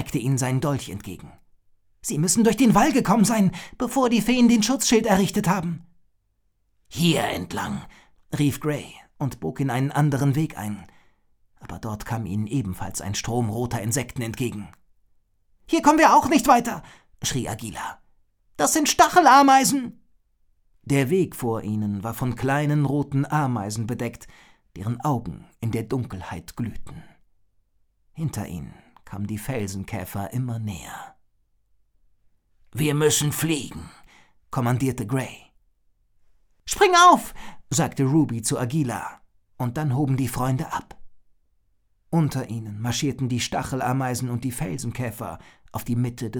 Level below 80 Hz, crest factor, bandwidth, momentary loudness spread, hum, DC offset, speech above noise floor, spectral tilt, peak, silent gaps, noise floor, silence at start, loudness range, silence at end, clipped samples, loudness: -50 dBFS; 20 dB; over 20 kHz; 17 LU; none; under 0.1%; 46 dB; -5 dB/octave; -4 dBFS; none; -69 dBFS; 0 s; 12 LU; 0 s; under 0.1%; -23 LUFS